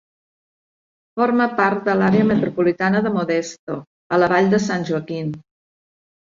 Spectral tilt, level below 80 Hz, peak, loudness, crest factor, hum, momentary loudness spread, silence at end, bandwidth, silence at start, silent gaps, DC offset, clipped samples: -6.5 dB/octave; -58 dBFS; -4 dBFS; -19 LUFS; 16 dB; none; 14 LU; 1 s; 7.6 kHz; 1.15 s; 3.59-3.67 s, 3.87-4.10 s; under 0.1%; under 0.1%